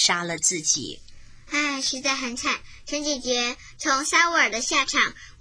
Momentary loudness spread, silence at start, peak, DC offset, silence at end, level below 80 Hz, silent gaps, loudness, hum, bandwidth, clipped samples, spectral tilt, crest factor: 10 LU; 0 s; -6 dBFS; under 0.1%; 0.1 s; -52 dBFS; none; -23 LUFS; none; 10.5 kHz; under 0.1%; -0.5 dB/octave; 20 dB